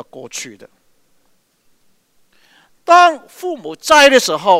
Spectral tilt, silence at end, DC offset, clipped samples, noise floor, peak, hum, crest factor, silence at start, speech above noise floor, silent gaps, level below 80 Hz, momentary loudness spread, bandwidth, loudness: -1.5 dB/octave; 0 s; under 0.1%; 0.1%; -58 dBFS; 0 dBFS; none; 16 dB; 0.15 s; 45 dB; none; -56 dBFS; 21 LU; 16 kHz; -11 LUFS